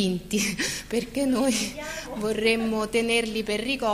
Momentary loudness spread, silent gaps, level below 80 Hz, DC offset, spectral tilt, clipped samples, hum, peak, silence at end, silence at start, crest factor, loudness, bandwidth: 7 LU; none; -48 dBFS; under 0.1%; -3.5 dB/octave; under 0.1%; none; -10 dBFS; 0 s; 0 s; 16 dB; -26 LUFS; 15.5 kHz